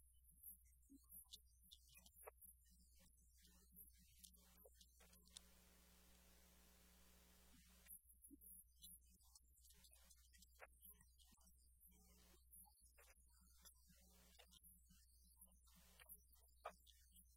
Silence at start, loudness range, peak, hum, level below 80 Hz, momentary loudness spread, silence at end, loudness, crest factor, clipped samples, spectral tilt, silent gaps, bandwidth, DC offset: 0 s; 4 LU; -40 dBFS; none; -76 dBFS; 8 LU; 0 s; -65 LUFS; 28 dB; under 0.1%; -2.5 dB/octave; none; 17.5 kHz; under 0.1%